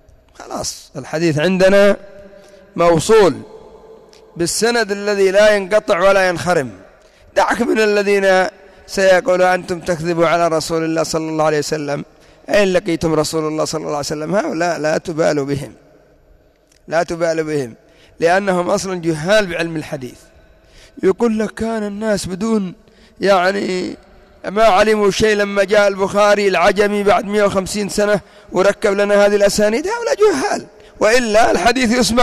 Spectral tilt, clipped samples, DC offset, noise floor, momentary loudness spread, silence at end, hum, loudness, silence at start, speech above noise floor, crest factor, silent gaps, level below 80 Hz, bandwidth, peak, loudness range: -4.5 dB/octave; under 0.1%; under 0.1%; -52 dBFS; 11 LU; 0 s; none; -15 LUFS; 0.4 s; 37 dB; 12 dB; none; -44 dBFS; 14.5 kHz; -4 dBFS; 6 LU